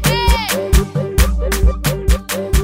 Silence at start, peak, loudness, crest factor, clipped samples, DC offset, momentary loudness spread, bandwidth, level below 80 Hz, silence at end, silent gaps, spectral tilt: 0 s; -2 dBFS; -16 LUFS; 14 dB; under 0.1%; under 0.1%; 3 LU; 16.5 kHz; -16 dBFS; 0 s; none; -4.5 dB/octave